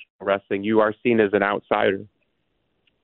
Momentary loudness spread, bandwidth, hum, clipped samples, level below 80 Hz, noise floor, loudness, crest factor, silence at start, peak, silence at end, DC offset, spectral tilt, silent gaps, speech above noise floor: 6 LU; 4.2 kHz; none; under 0.1%; -62 dBFS; -72 dBFS; -21 LUFS; 20 dB; 0 s; -4 dBFS; 1 s; under 0.1%; -10.5 dB/octave; 0.10-0.19 s; 51 dB